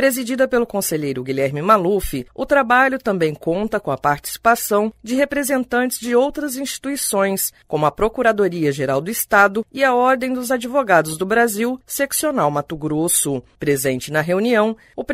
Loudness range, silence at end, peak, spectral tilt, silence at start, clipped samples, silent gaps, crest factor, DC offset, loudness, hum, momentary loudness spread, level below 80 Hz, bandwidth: 2 LU; 0 s; -2 dBFS; -4 dB/octave; 0 s; under 0.1%; none; 18 dB; under 0.1%; -18 LUFS; none; 8 LU; -44 dBFS; 16 kHz